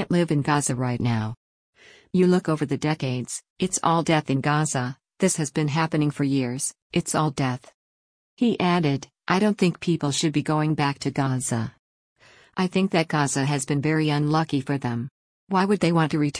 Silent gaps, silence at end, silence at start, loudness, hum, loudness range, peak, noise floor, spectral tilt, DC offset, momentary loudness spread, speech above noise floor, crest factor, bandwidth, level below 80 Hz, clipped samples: 1.37-1.73 s, 3.50-3.56 s, 6.82-6.90 s, 7.74-8.37 s, 11.79-12.16 s, 15.11-15.47 s; 0 s; 0 s; -24 LUFS; none; 2 LU; -8 dBFS; under -90 dBFS; -5.5 dB/octave; under 0.1%; 7 LU; over 67 dB; 16 dB; 10.5 kHz; -58 dBFS; under 0.1%